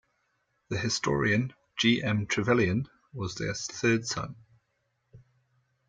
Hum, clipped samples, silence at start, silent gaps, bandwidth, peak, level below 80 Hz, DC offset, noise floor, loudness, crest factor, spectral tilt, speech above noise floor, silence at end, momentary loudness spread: none; under 0.1%; 0.7 s; none; 9.4 kHz; -12 dBFS; -60 dBFS; under 0.1%; -76 dBFS; -28 LUFS; 18 dB; -4.5 dB/octave; 49 dB; 0.7 s; 11 LU